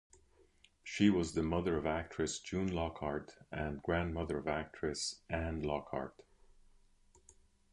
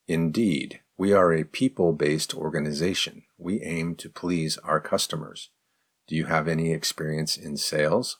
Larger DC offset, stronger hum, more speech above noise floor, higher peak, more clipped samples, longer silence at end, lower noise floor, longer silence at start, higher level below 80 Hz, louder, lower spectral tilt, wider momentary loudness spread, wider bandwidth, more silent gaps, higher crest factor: neither; neither; second, 31 dB vs 49 dB; second, -16 dBFS vs -8 dBFS; neither; first, 1.6 s vs 0.05 s; second, -68 dBFS vs -74 dBFS; first, 0.85 s vs 0.1 s; first, -52 dBFS vs -58 dBFS; second, -37 LUFS vs -26 LUFS; about the same, -5.5 dB/octave vs -4.5 dB/octave; about the same, 11 LU vs 10 LU; second, 11 kHz vs 19 kHz; neither; about the same, 22 dB vs 18 dB